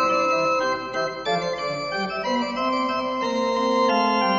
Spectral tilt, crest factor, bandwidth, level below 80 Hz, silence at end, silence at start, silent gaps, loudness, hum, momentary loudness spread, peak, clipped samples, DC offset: -2 dB/octave; 14 dB; 7.8 kHz; -56 dBFS; 0 s; 0 s; none; -23 LUFS; none; 6 LU; -8 dBFS; under 0.1%; under 0.1%